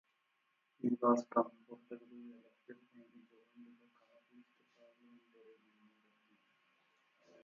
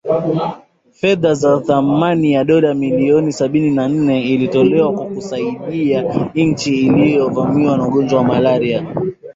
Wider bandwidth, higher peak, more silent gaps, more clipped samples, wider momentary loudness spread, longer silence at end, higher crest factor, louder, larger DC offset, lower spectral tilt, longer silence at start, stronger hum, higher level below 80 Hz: second, 6.8 kHz vs 7.8 kHz; second, -18 dBFS vs -2 dBFS; neither; neither; first, 29 LU vs 8 LU; first, 3.8 s vs 0.05 s; first, 26 dB vs 12 dB; second, -36 LUFS vs -15 LUFS; neither; about the same, -7 dB/octave vs -7 dB/octave; first, 0.85 s vs 0.05 s; neither; second, under -90 dBFS vs -50 dBFS